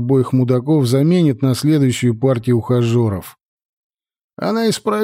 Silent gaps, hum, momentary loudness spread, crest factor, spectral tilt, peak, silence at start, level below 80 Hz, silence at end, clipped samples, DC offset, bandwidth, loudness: 3.45-3.58 s, 3.65-3.90 s, 4.24-4.29 s; none; 5 LU; 12 dB; -7 dB/octave; -4 dBFS; 0 s; -54 dBFS; 0 s; under 0.1%; under 0.1%; 16 kHz; -16 LUFS